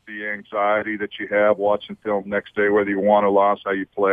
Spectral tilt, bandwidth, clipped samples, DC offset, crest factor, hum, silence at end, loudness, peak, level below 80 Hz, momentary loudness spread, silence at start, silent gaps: -8 dB/octave; 3.8 kHz; under 0.1%; under 0.1%; 18 dB; none; 0 s; -21 LUFS; -2 dBFS; -62 dBFS; 9 LU; 0.05 s; none